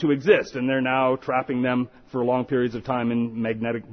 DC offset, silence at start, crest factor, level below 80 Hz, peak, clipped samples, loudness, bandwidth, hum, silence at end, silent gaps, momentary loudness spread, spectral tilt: under 0.1%; 0 s; 18 dB; -58 dBFS; -4 dBFS; under 0.1%; -24 LUFS; 6.4 kHz; none; 0 s; none; 7 LU; -7.5 dB/octave